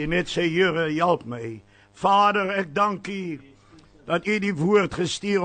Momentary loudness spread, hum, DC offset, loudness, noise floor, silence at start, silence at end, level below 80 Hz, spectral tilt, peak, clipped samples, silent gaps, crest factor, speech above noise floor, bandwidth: 15 LU; none; under 0.1%; -23 LUFS; -52 dBFS; 0 s; 0 s; -52 dBFS; -5.5 dB/octave; -8 dBFS; under 0.1%; none; 16 dB; 29 dB; 9.4 kHz